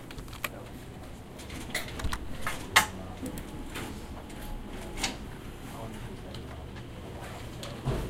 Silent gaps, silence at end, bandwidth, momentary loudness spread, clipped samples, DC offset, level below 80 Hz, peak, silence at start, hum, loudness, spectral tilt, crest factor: none; 0 s; 16.5 kHz; 11 LU; under 0.1%; under 0.1%; -44 dBFS; -6 dBFS; 0 s; none; -35 LUFS; -3 dB/octave; 30 dB